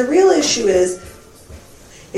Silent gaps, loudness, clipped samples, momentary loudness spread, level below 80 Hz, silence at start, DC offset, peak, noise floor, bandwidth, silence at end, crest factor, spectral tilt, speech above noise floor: none; -15 LUFS; under 0.1%; 9 LU; -46 dBFS; 0 s; under 0.1%; -2 dBFS; -42 dBFS; 13 kHz; 0 s; 16 dB; -3 dB/octave; 27 dB